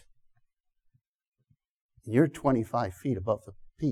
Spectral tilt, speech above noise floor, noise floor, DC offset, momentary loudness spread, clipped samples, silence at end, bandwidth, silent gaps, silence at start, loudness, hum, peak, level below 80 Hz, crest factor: -8 dB/octave; 45 dB; -73 dBFS; under 0.1%; 8 LU; under 0.1%; 0 s; 14 kHz; none; 2.05 s; -29 LUFS; none; -10 dBFS; -58 dBFS; 22 dB